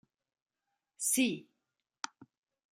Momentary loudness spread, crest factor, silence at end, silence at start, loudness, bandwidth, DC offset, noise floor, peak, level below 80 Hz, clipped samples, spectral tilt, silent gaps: 16 LU; 22 dB; 0.5 s; 1 s; -33 LUFS; 16 kHz; under 0.1%; -87 dBFS; -16 dBFS; -86 dBFS; under 0.1%; -2 dB/octave; none